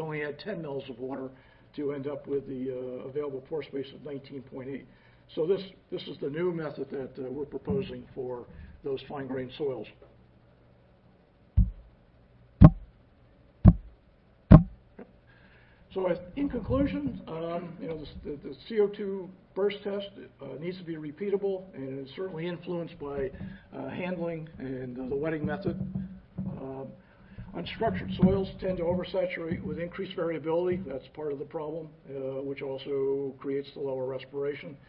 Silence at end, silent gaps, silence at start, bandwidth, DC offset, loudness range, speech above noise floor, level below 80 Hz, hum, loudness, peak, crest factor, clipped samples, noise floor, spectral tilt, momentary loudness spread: 0.15 s; none; 0 s; 5.2 kHz; under 0.1%; 11 LU; 27 dB; -40 dBFS; none; -31 LUFS; -2 dBFS; 28 dB; under 0.1%; -60 dBFS; -12 dB/octave; 14 LU